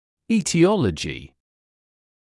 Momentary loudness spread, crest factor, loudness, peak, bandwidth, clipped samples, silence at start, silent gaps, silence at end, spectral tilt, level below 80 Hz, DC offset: 13 LU; 18 dB; -21 LUFS; -4 dBFS; 12 kHz; under 0.1%; 0.3 s; none; 1.05 s; -5.5 dB/octave; -50 dBFS; under 0.1%